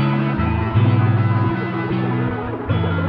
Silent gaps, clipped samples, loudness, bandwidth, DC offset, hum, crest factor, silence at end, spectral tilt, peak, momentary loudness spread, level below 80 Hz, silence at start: none; under 0.1%; -19 LUFS; 5 kHz; under 0.1%; none; 12 dB; 0 s; -10.5 dB/octave; -6 dBFS; 6 LU; -36 dBFS; 0 s